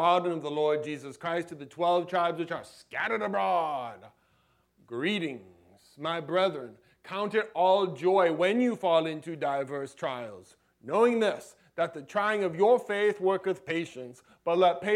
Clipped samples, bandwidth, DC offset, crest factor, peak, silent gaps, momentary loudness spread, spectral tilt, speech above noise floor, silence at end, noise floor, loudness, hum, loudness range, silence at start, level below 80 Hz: under 0.1%; 13.5 kHz; under 0.1%; 18 dB; -12 dBFS; none; 14 LU; -5.5 dB/octave; 41 dB; 0 s; -69 dBFS; -29 LUFS; none; 5 LU; 0 s; -78 dBFS